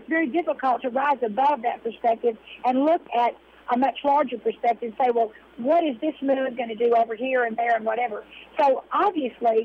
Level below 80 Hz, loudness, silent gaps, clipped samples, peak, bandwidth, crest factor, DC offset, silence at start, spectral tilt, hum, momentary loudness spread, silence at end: -68 dBFS; -24 LUFS; none; under 0.1%; -12 dBFS; 6.4 kHz; 12 dB; under 0.1%; 0 s; -6.5 dB/octave; none; 6 LU; 0 s